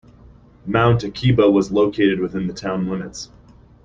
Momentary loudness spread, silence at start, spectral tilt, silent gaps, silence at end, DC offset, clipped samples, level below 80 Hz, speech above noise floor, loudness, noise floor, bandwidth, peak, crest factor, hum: 17 LU; 0.65 s; -7 dB/octave; none; 0.6 s; under 0.1%; under 0.1%; -44 dBFS; 29 dB; -19 LUFS; -47 dBFS; 7.6 kHz; -2 dBFS; 18 dB; 60 Hz at -35 dBFS